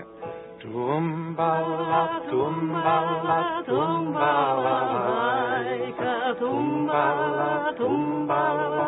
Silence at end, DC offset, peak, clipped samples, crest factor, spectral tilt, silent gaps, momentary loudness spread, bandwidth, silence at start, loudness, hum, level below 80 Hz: 0 s; under 0.1%; -8 dBFS; under 0.1%; 18 dB; -10.5 dB/octave; none; 5 LU; 4.1 kHz; 0 s; -24 LUFS; none; -66 dBFS